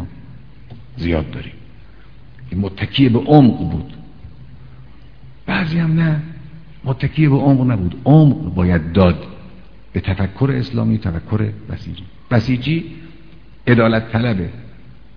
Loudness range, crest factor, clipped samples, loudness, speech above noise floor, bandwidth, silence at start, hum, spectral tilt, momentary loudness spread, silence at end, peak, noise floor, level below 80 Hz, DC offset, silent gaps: 6 LU; 18 dB; under 0.1%; -16 LUFS; 28 dB; 5.4 kHz; 0 s; none; -9.5 dB/octave; 22 LU; 0.45 s; 0 dBFS; -43 dBFS; -38 dBFS; 1%; none